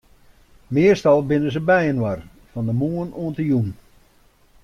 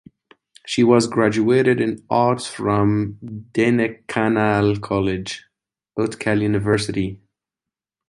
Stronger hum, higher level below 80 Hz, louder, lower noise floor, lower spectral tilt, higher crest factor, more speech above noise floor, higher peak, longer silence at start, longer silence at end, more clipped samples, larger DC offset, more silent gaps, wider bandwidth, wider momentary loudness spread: neither; about the same, -48 dBFS vs -48 dBFS; about the same, -20 LUFS vs -19 LUFS; second, -56 dBFS vs -88 dBFS; first, -8 dB/octave vs -6 dB/octave; about the same, 16 dB vs 18 dB; second, 37 dB vs 69 dB; about the same, -4 dBFS vs -2 dBFS; about the same, 0.7 s vs 0.65 s; about the same, 0.9 s vs 0.95 s; neither; neither; neither; first, 13 kHz vs 11.5 kHz; about the same, 12 LU vs 11 LU